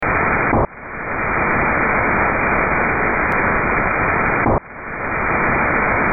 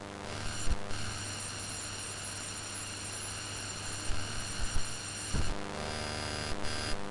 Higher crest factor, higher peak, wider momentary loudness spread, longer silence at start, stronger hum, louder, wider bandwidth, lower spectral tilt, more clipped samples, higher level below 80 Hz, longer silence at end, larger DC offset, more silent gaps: second, 12 dB vs 18 dB; first, -4 dBFS vs -16 dBFS; first, 6 LU vs 2 LU; about the same, 0 s vs 0 s; neither; first, -17 LUFS vs -37 LUFS; second, 6.4 kHz vs 11.5 kHz; first, -10.5 dB/octave vs -2.5 dB/octave; neither; first, -32 dBFS vs -42 dBFS; about the same, 0 s vs 0 s; neither; neither